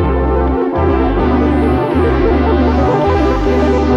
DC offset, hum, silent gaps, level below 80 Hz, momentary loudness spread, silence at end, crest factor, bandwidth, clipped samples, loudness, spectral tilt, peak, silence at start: under 0.1%; none; none; -18 dBFS; 2 LU; 0 s; 10 dB; 7.2 kHz; under 0.1%; -13 LUFS; -8.5 dB/octave; -2 dBFS; 0 s